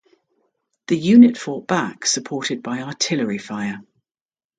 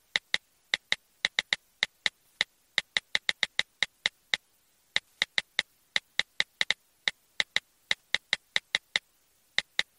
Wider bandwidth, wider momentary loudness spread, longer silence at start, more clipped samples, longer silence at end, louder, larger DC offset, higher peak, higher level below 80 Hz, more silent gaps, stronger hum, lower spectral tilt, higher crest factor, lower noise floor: second, 9.4 kHz vs 16 kHz; first, 16 LU vs 5 LU; first, 0.9 s vs 0.15 s; neither; first, 0.75 s vs 0.15 s; first, -19 LUFS vs -30 LUFS; neither; first, 0 dBFS vs -6 dBFS; first, -64 dBFS vs -70 dBFS; neither; neither; first, -4 dB/octave vs 1 dB/octave; second, 20 dB vs 28 dB; first, under -90 dBFS vs -68 dBFS